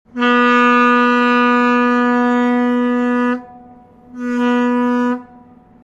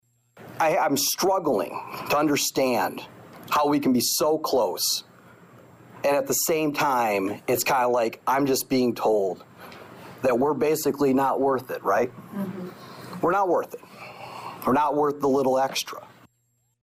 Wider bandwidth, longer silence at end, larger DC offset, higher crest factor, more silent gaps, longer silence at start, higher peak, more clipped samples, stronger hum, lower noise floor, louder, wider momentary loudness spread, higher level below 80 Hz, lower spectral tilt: second, 7.4 kHz vs 16 kHz; second, 0.6 s vs 0.75 s; neither; about the same, 14 dB vs 12 dB; neither; second, 0.15 s vs 0.4 s; first, -2 dBFS vs -14 dBFS; neither; neither; second, -44 dBFS vs -70 dBFS; first, -14 LUFS vs -24 LUFS; second, 9 LU vs 17 LU; about the same, -58 dBFS vs -62 dBFS; first, -5 dB/octave vs -3.5 dB/octave